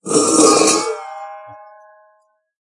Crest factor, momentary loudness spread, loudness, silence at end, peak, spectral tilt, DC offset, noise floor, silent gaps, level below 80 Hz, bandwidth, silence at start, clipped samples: 18 dB; 23 LU; -13 LUFS; 1.05 s; 0 dBFS; -2 dB/octave; under 0.1%; -59 dBFS; none; -62 dBFS; 11.5 kHz; 0.05 s; under 0.1%